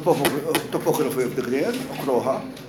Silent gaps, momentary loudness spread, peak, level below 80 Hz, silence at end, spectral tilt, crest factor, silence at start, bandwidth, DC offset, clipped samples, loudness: none; 4 LU; -6 dBFS; -60 dBFS; 0 s; -5 dB/octave; 18 dB; 0 s; 17 kHz; under 0.1%; under 0.1%; -23 LUFS